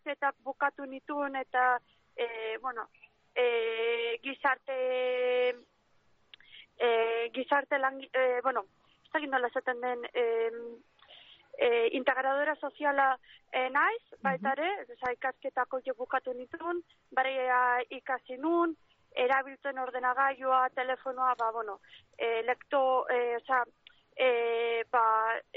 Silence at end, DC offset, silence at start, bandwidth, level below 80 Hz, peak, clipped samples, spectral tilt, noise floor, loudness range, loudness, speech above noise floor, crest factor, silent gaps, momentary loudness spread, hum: 0.15 s; under 0.1%; 0.05 s; 5 kHz; -80 dBFS; -14 dBFS; under 0.1%; -0.5 dB/octave; -68 dBFS; 3 LU; -31 LUFS; 37 dB; 18 dB; none; 10 LU; none